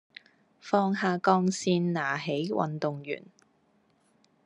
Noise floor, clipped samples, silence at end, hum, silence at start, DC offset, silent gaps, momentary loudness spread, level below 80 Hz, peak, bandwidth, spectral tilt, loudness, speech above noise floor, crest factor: -68 dBFS; under 0.1%; 1.25 s; none; 0.65 s; under 0.1%; none; 13 LU; -76 dBFS; -8 dBFS; 10.5 kHz; -5.5 dB/octave; -28 LUFS; 40 dB; 22 dB